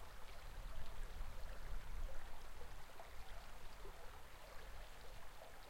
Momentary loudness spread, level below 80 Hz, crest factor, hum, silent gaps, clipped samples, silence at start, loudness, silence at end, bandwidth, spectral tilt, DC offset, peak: 5 LU; -52 dBFS; 14 dB; none; none; under 0.1%; 0 s; -57 LUFS; 0 s; 16.5 kHz; -4 dB/octave; under 0.1%; -32 dBFS